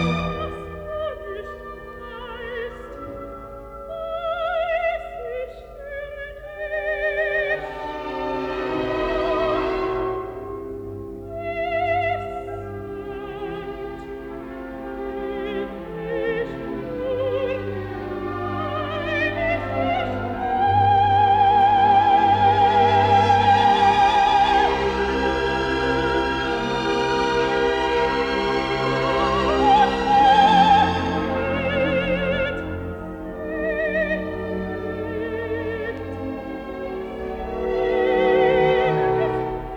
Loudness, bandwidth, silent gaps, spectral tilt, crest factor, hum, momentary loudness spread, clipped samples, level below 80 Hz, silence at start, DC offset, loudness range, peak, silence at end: -21 LUFS; 9.2 kHz; none; -6 dB/octave; 16 dB; none; 17 LU; under 0.1%; -42 dBFS; 0 s; under 0.1%; 12 LU; -4 dBFS; 0 s